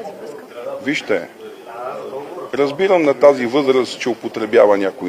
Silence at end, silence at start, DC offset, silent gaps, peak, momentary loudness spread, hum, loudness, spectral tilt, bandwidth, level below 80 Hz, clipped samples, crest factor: 0 s; 0 s; under 0.1%; none; 0 dBFS; 19 LU; none; -16 LUFS; -5 dB/octave; 15 kHz; -66 dBFS; under 0.1%; 18 dB